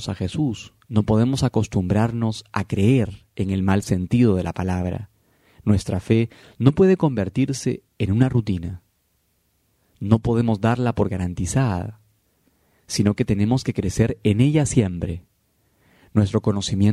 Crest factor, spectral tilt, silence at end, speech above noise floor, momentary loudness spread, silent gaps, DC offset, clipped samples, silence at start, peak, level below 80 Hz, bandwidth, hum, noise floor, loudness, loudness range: 20 dB; -7 dB/octave; 0 s; 47 dB; 10 LU; none; under 0.1%; under 0.1%; 0 s; 0 dBFS; -44 dBFS; 12.5 kHz; none; -67 dBFS; -21 LUFS; 3 LU